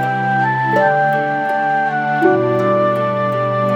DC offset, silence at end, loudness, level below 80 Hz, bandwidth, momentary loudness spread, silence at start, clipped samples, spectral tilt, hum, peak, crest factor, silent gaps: under 0.1%; 0 s; -15 LUFS; -68 dBFS; 13.5 kHz; 3 LU; 0 s; under 0.1%; -7.5 dB/octave; none; -2 dBFS; 14 dB; none